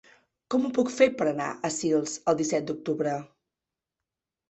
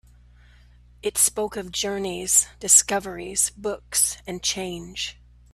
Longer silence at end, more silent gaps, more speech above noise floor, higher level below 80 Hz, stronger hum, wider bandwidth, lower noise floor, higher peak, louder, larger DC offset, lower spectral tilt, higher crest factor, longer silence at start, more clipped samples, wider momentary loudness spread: first, 1.25 s vs 0.4 s; neither; first, 63 dB vs 27 dB; second, -68 dBFS vs -52 dBFS; second, none vs 60 Hz at -50 dBFS; second, 8.4 kHz vs 15.5 kHz; first, -89 dBFS vs -52 dBFS; second, -8 dBFS vs -2 dBFS; second, -27 LUFS vs -22 LUFS; neither; first, -4.5 dB/octave vs -1 dB/octave; about the same, 20 dB vs 22 dB; second, 0.5 s vs 1.05 s; neither; second, 8 LU vs 16 LU